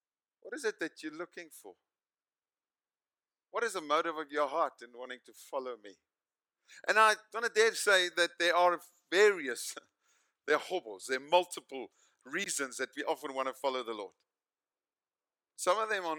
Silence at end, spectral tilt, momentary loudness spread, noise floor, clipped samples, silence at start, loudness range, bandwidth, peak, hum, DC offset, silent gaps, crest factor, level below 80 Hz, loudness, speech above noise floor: 0 s; -1 dB/octave; 19 LU; under -90 dBFS; under 0.1%; 0.45 s; 10 LU; 19 kHz; -12 dBFS; none; under 0.1%; none; 24 dB; under -90 dBFS; -32 LUFS; over 57 dB